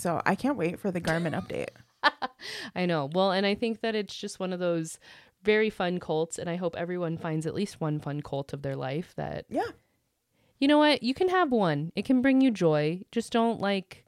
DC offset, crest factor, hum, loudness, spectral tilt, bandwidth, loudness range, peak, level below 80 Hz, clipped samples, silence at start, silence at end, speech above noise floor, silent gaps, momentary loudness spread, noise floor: under 0.1%; 22 dB; none; -28 LUFS; -5.5 dB/octave; 14 kHz; 8 LU; -8 dBFS; -62 dBFS; under 0.1%; 0 s; 0.15 s; 46 dB; none; 12 LU; -74 dBFS